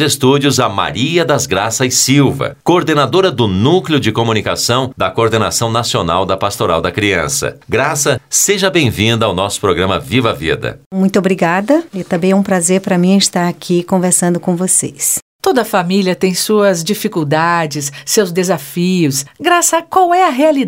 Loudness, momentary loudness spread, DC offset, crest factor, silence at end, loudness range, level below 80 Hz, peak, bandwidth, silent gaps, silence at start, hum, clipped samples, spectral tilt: -13 LUFS; 5 LU; under 0.1%; 12 dB; 0 s; 2 LU; -44 dBFS; 0 dBFS; 16.5 kHz; 10.86-10.91 s, 15.22-15.39 s; 0 s; none; under 0.1%; -4 dB/octave